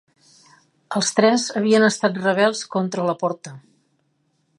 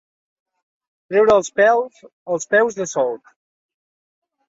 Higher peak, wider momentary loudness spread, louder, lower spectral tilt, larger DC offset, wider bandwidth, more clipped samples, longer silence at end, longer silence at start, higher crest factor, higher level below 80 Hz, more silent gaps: about the same, -2 dBFS vs -4 dBFS; about the same, 10 LU vs 11 LU; about the same, -20 LUFS vs -18 LUFS; about the same, -4 dB/octave vs -3.5 dB/octave; neither; first, 11.5 kHz vs 8 kHz; neither; second, 1 s vs 1.3 s; second, 0.9 s vs 1.1 s; about the same, 20 dB vs 18 dB; second, -72 dBFS vs -60 dBFS; second, none vs 2.13-2.26 s